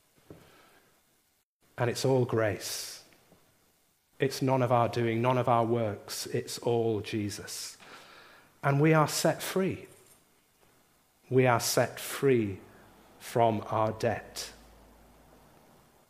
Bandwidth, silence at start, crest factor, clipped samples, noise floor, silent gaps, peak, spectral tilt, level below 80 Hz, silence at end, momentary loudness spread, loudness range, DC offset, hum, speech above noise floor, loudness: 15.5 kHz; 0.3 s; 22 dB; under 0.1%; -72 dBFS; 1.43-1.60 s; -8 dBFS; -5 dB/octave; -68 dBFS; 1.55 s; 16 LU; 4 LU; under 0.1%; none; 44 dB; -29 LUFS